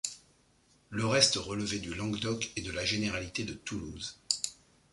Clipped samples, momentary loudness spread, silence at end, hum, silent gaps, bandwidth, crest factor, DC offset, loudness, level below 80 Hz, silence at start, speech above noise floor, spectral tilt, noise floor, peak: under 0.1%; 15 LU; 0.4 s; none; none; 11.5 kHz; 26 dB; under 0.1%; -32 LUFS; -56 dBFS; 0.05 s; 34 dB; -3 dB/octave; -67 dBFS; -8 dBFS